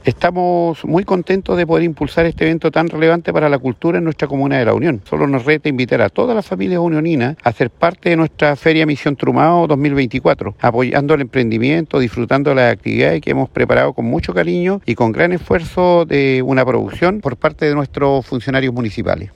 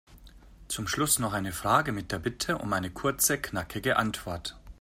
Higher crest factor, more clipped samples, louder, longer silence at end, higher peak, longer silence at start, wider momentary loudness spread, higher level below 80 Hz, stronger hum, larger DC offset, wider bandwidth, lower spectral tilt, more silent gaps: second, 14 dB vs 22 dB; neither; first, -15 LUFS vs -29 LUFS; about the same, 0.05 s vs 0.1 s; first, 0 dBFS vs -8 dBFS; about the same, 0.05 s vs 0.1 s; second, 4 LU vs 10 LU; first, -40 dBFS vs -50 dBFS; neither; neither; second, 10.5 kHz vs 16 kHz; first, -8 dB/octave vs -3 dB/octave; neither